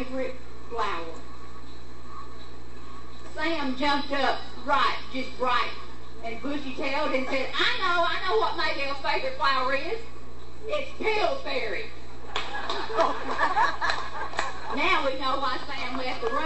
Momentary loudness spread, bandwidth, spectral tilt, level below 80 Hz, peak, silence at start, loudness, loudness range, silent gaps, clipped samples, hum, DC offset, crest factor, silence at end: 20 LU; 8.4 kHz; -4 dB/octave; -50 dBFS; -10 dBFS; 0 s; -27 LUFS; 5 LU; none; under 0.1%; none; 5%; 20 dB; 0 s